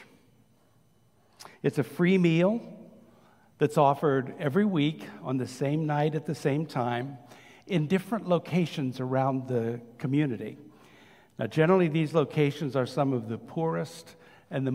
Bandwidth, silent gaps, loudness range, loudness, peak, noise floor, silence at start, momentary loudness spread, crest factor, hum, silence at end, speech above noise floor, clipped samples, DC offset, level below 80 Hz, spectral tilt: 15.5 kHz; none; 3 LU; -28 LUFS; -10 dBFS; -65 dBFS; 0 s; 12 LU; 20 dB; none; 0 s; 38 dB; under 0.1%; under 0.1%; -72 dBFS; -7.5 dB/octave